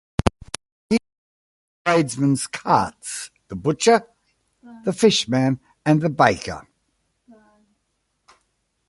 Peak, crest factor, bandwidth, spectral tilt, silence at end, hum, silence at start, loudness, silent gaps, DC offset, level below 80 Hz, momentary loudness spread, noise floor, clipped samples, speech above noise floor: 0 dBFS; 22 dB; 11.5 kHz; -5 dB/octave; 2.25 s; none; 0.25 s; -21 LUFS; 0.72-0.89 s, 1.18-1.85 s; under 0.1%; -44 dBFS; 15 LU; -72 dBFS; under 0.1%; 53 dB